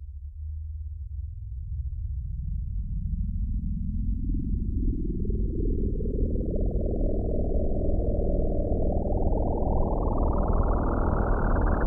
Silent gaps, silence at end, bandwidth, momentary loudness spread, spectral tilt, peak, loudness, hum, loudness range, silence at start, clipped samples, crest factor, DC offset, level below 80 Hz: none; 0 s; 1.9 kHz; 10 LU; -13 dB/octave; -12 dBFS; -30 LUFS; none; 6 LU; 0 s; under 0.1%; 14 dB; under 0.1%; -28 dBFS